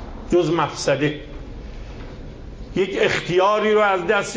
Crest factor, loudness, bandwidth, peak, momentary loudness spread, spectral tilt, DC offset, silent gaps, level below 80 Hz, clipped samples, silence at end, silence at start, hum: 16 dB; -19 LUFS; 8 kHz; -4 dBFS; 20 LU; -5 dB/octave; under 0.1%; none; -38 dBFS; under 0.1%; 0 s; 0 s; none